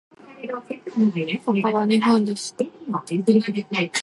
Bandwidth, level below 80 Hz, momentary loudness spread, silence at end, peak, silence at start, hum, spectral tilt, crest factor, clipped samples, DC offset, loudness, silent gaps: 11.5 kHz; -72 dBFS; 13 LU; 0 s; -6 dBFS; 0.25 s; none; -5.5 dB/octave; 16 dB; under 0.1%; under 0.1%; -22 LUFS; none